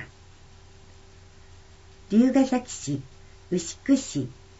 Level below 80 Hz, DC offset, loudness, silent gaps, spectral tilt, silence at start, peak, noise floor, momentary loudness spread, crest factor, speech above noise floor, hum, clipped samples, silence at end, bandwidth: -54 dBFS; under 0.1%; -25 LUFS; none; -5.5 dB/octave; 0 s; -10 dBFS; -50 dBFS; 12 LU; 18 dB; 26 dB; none; under 0.1%; 0.3 s; 8 kHz